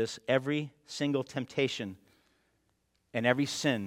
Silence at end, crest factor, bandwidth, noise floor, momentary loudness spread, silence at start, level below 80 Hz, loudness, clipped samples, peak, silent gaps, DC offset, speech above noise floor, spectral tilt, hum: 0 s; 24 dB; 16 kHz; -75 dBFS; 10 LU; 0 s; -74 dBFS; -32 LUFS; under 0.1%; -10 dBFS; none; under 0.1%; 44 dB; -5 dB/octave; none